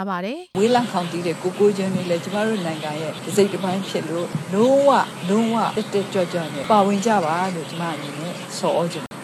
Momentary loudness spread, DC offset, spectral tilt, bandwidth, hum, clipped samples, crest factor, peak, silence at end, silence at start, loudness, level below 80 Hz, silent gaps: 10 LU; under 0.1%; -5.5 dB/octave; 14 kHz; none; under 0.1%; 18 dB; -4 dBFS; 0 s; 0 s; -21 LUFS; -68 dBFS; none